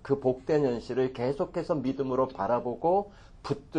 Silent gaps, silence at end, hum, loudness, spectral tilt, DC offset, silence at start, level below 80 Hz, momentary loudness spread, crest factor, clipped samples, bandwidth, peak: none; 0 s; none; -29 LUFS; -8 dB/octave; under 0.1%; 0.05 s; -54 dBFS; 8 LU; 16 dB; under 0.1%; 9.6 kHz; -14 dBFS